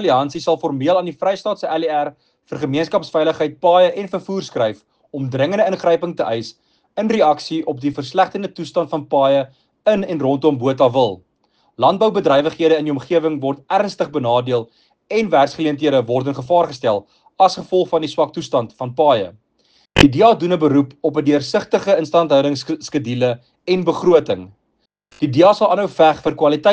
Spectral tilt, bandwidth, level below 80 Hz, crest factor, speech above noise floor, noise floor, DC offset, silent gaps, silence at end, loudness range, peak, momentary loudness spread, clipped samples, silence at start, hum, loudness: -6 dB/octave; 9.2 kHz; -46 dBFS; 16 dB; 52 dB; -68 dBFS; under 0.1%; none; 0 s; 3 LU; 0 dBFS; 9 LU; under 0.1%; 0 s; none; -17 LUFS